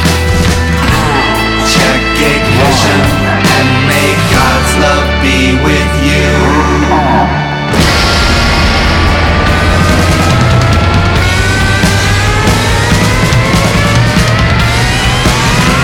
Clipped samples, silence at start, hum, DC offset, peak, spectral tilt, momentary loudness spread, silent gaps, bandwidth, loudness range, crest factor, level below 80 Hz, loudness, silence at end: under 0.1%; 0 s; none; under 0.1%; 0 dBFS; -4.5 dB/octave; 2 LU; none; 18 kHz; 1 LU; 8 dB; -18 dBFS; -8 LUFS; 0 s